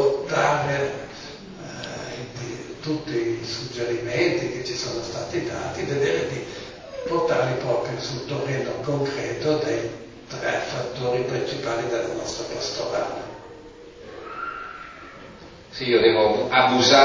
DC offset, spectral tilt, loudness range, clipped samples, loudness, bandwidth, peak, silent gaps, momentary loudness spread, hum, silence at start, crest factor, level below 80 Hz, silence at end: under 0.1%; -4.5 dB/octave; 5 LU; under 0.1%; -25 LUFS; 7.6 kHz; -2 dBFS; none; 19 LU; none; 0 s; 22 dB; -54 dBFS; 0 s